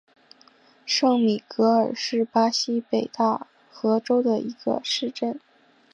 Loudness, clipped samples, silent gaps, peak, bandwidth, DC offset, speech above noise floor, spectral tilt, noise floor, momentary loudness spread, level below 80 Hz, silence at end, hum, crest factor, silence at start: -23 LUFS; under 0.1%; none; -8 dBFS; 9.8 kHz; under 0.1%; 33 dB; -4 dB/octave; -56 dBFS; 9 LU; -76 dBFS; 0.55 s; none; 16 dB; 0.85 s